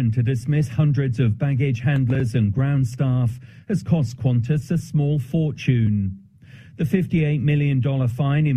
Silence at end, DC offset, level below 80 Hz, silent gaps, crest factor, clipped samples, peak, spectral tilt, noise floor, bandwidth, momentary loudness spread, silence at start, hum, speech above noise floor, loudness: 0 s; under 0.1%; -46 dBFS; none; 14 dB; under 0.1%; -6 dBFS; -8.5 dB/octave; -45 dBFS; 10.5 kHz; 4 LU; 0 s; none; 25 dB; -21 LUFS